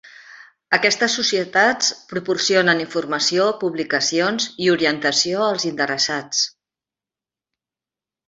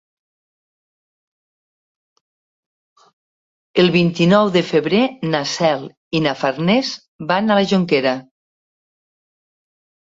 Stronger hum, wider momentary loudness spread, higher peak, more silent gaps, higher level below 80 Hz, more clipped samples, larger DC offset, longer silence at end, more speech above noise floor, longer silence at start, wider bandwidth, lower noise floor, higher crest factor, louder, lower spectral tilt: neither; second, 5 LU vs 9 LU; about the same, 0 dBFS vs -2 dBFS; second, none vs 5.97-6.11 s, 7.08-7.19 s; second, -66 dBFS vs -58 dBFS; neither; neither; about the same, 1.8 s vs 1.9 s; second, 70 dB vs over 74 dB; second, 0.05 s vs 3.75 s; about the same, 8 kHz vs 7.8 kHz; about the same, -90 dBFS vs under -90 dBFS; about the same, 20 dB vs 18 dB; about the same, -19 LUFS vs -17 LUFS; second, -2 dB/octave vs -6 dB/octave